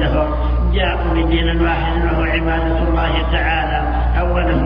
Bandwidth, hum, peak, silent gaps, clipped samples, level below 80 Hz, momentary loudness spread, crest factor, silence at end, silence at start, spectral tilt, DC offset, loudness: 5.2 kHz; 60 Hz at -20 dBFS; -4 dBFS; none; under 0.1%; -18 dBFS; 2 LU; 12 dB; 0 s; 0 s; -9 dB/octave; under 0.1%; -17 LUFS